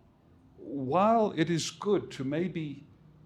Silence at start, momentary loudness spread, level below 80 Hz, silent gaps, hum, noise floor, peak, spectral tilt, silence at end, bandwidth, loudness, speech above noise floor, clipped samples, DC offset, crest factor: 0.6 s; 16 LU; -66 dBFS; none; none; -60 dBFS; -12 dBFS; -5.5 dB/octave; 0.45 s; 13.5 kHz; -29 LUFS; 31 dB; under 0.1%; under 0.1%; 18 dB